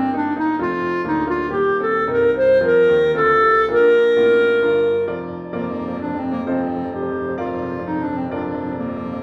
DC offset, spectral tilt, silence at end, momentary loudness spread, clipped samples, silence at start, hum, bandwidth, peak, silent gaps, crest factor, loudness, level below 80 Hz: under 0.1%; -7.5 dB/octave; 0 s; 11 LU; under 0.1%; 0 s; none; 6 kHz; -6 dBFS; none; 12 dB; -18 LUFS; -50 dBFS